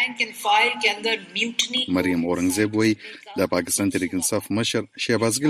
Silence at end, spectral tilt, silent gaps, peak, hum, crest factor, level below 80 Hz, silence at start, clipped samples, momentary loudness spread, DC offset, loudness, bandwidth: 0 s; -3 dB/octave; none; -6 dBFS; none; 16 dB; -58 dBFS; 0 s; under 0.1%; 5 LU; under 0.1%; -22 LUFS; 15.5 kHz